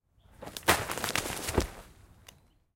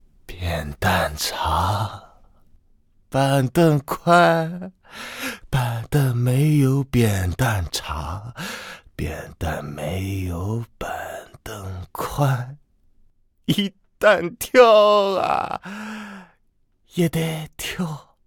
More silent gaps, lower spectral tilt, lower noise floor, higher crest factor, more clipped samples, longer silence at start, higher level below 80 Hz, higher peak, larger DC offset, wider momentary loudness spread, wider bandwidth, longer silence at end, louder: neither; second, -3 dB/octave vs -5.5 dB/octave; second, -59 dBFS vs -63 dBFS; first, 30 dB vs 20 dB; neither; about the same, 0.4 s vs 0.3 s; about the same, -46 dBFS vs -42 dBFS; second, -4 dBFS vs 0 dBFS; neither; about the same, 18 LU vs 17 LU; second, 17 kHz vs 19 kHz; first, 0.85 s vs 0.25 s; second, -30 LUFS vs -21 LUFS